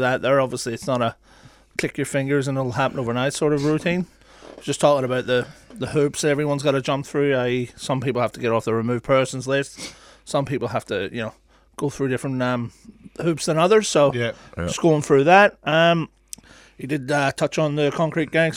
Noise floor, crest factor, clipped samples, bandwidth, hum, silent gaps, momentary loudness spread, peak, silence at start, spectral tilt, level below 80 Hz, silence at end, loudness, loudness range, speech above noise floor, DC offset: -43 dBFS; 20 dB; under 0.1%; 16 kHz; none; none; 13 LU; -2 dBFS; 0 s; -5 dB/octave; -54 dBFS; 0 s; -21 LUFS; 7 LU; 22 dB; under 0.1%